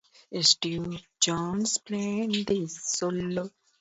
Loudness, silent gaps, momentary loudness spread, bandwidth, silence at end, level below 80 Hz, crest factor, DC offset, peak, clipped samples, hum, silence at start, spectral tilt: -27 LUFS; none; 13 LU; 8.2 kHz; 0.3 s; -60 dBFS; 24 dB; under 0.1%; -6 dBFS; under 0.1%; none; 0.3 s; -3 dB/octave